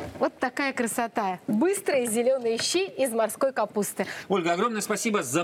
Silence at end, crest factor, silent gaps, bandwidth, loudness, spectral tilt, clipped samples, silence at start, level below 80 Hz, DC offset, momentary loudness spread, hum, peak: 0 s; 16 dB; none; 17 kHz; -26 LUFS; -3.5 dB/octave; under 0.1%; 0 s; -68 dBFS; under 0.1%; 4 LU; none; -10 dBFS